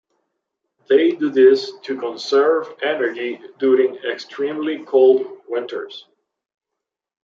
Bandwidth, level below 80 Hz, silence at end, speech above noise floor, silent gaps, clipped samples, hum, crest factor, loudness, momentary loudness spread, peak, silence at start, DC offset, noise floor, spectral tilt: 7.2 kHz; -78 dBFS; 1.25 s; 65 dB; none; under 0.1%; none; 16 dB; -18 LUFS; 14 LU; -2 dBFS; 0.9 s; under 0.1%; -83 dBFS; -4.5 dB/octave